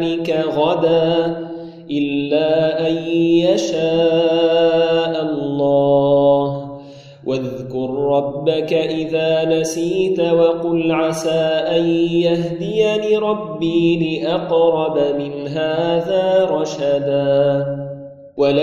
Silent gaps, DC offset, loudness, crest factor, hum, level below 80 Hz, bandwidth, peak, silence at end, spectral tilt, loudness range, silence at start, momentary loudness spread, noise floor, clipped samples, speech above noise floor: none; under 0.1%; -17 LUFS; 14 dB; none; -52 dBFS; 12.5 kHz; -2 dBFS; 0 s; -6 dB/octave; 3 LU; 0 s; 9 LU; -38 dBFS; under 0.1%; 21 dB